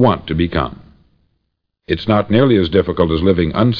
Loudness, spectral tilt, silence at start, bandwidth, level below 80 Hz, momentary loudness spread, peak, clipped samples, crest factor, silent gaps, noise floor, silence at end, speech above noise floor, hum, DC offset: -15 LUFS; -9.5 dB/octave; 0 s; 5.4 kHz; -34 dBFS; 9 LU; 0 dBFS; under 0.1%; 14 dB; none; -71 dBFS; 0 s; 57 dB; none; under 0.1%